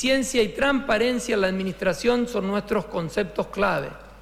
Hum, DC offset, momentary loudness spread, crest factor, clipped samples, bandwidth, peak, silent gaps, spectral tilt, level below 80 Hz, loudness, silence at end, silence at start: none; under 0.1%; 6 LU; 16 dB; under 0.1%; 16 kHz; -8 dBFS; none; -4.5 dB/octave; -46 dBFS; -24 LUFS; 0 s; 0 s